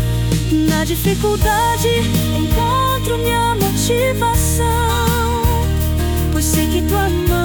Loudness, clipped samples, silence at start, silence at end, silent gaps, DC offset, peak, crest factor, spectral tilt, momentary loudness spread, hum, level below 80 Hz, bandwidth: -16 LUFS; under 0.1%; 0 s; 0 s; none; under 0.1%; -4 dBFS; 12 dB; -5 dB/octave; 2 LU; none; -24 dBFS; 19.5 kHz